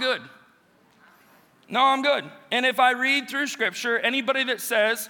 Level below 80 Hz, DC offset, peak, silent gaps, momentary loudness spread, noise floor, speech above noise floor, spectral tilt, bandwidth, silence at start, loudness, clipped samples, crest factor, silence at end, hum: -86 dBFS; under 0.1%; -6 dBFS; none; 8 LU; -60 dBFS; 36 dB; -1.5 dB/octave; 19.5 kHz; 0 s; -23 LUFS; under 0.1%; 18 dB; 0 s; none